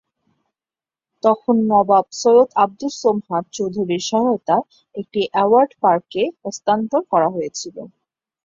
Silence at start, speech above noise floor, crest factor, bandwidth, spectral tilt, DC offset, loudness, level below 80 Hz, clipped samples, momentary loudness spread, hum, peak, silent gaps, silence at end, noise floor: 1.25 s; over 72 dB; 18 dB; 7.8 kHz; -5 dB/octave; under 0.1%; -18 LUFS; -64 dBFS; under 0.1%; 11 LU; none; -2 dBFS; none; 0.6 s; under -90 dBFS